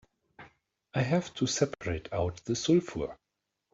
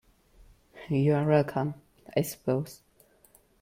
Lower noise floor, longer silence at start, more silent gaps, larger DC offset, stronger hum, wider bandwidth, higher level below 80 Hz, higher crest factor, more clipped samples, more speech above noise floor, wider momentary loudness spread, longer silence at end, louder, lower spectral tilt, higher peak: first, -85 dBFS vs -62 dBFS; second, 0.4 s vs 0.75 s; neither; neither; neither; second, 8 kHz vs 16.5 kHz; first, -56 dBFS vs -62 dBFS; about the same, 20 dB vs 18 dB; neither; first, 55 dB vs 35 dB; second, 10 LU vs 17 LU; second, 0.6 s vs 0.85 s; second, -31 LUFS vs -28 LUFS; second, -5 dB/octave vs -7 dB/octave; about the same, -12 dBFS vs -12 dBFS